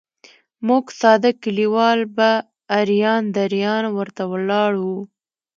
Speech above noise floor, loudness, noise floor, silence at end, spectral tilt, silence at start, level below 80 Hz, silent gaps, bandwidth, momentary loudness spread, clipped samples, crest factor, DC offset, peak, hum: 34 dB; -19 LUFS; -51 dBFS; 0.5 s; -6 dB/octave; 0.6 s; -72 dBFS; none; 7.4 kHz; 9 LU; under 0.1%; 18 dB; under 0.1%; 0 dBFS; none